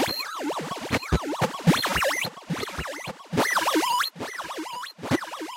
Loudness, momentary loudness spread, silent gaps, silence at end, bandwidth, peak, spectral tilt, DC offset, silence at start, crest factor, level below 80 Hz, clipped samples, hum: -26 LUFS; 11 LU; none; 0 s; 16.5 kHz; -8 dBFS; -4 dB/octave; under 0.1%; 0 s; 20 dB; -44 dBFS; under 0.1%; none